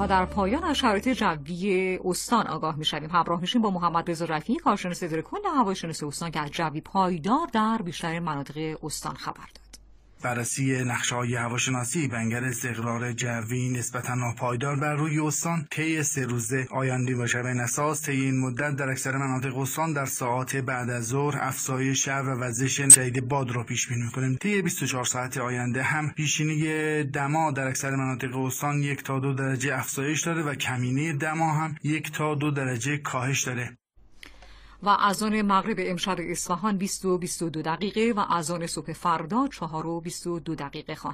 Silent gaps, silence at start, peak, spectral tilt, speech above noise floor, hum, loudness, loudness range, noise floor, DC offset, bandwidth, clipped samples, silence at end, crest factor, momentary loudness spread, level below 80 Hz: none; 0 s; 0 dBFS; -4 dB/octave; 24 dB; none; -26 LUFS; 7 LU; -51 dBFS; under 0.1%; 15.5 kHz; under 0.1%; 0 s; 26 dB; 6 LU; -54 dBFS